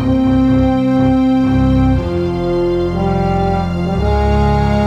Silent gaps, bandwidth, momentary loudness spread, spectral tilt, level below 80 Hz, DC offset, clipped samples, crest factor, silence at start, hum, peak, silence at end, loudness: none; 7.6 kHz; 4 LU; -9 dB/octave; -22 dBFS; under 0.1%; under 0.1%; 10 dB; 0 s; none; -2 dBFS; 0 s; -14 LUFS